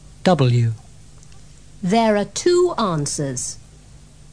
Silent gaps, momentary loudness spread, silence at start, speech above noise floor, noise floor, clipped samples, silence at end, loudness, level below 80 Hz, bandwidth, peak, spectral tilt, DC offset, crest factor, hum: none; 12 LU; 0.25 s; 27 dB; -45 dBFS; under 0.1%; 0.35 s; -19 LUFS; -48 dBFS; 10.5 kHz; -2 dBFS; -5.5 dB/octave; 0.5%; 18 dB; none